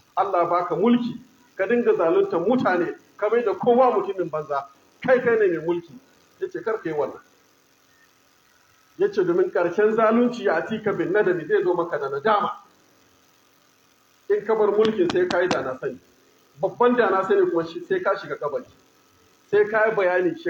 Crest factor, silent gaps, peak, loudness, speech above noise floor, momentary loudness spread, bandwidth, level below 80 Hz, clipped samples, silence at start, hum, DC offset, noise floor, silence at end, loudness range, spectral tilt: 16 dB; none; -6 dBFS; -22 LUFS; 38 dB; 10 LU; 7.8 kHz; -70 dBFS; under 0.1%; 0.15 s; none; under 0.1%; -59 dBFS; 0 s; 5 LU; -6.5 dB/octave